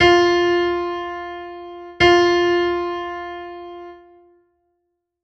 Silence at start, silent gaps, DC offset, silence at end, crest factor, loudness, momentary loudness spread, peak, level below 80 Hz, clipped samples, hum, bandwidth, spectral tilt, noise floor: 0 s; none; under 0.1%; 1.3 s; 20 dB; -18 LUFS; 21 LU; 0 dBFS; -46 dBFS; under 0.1%; none; 7.6 kHz; -4.5 dB/octave; -74 dBFS